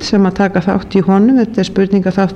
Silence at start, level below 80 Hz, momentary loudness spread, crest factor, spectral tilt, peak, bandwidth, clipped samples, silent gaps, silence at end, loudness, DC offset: 0 s; -40 dBFS; 5 LU; 10 dB; -7 dB/octave; -2 dBFS; 8.4 kHz; under 0.1%; none; 0 s; -12 LUFS; under 0.1%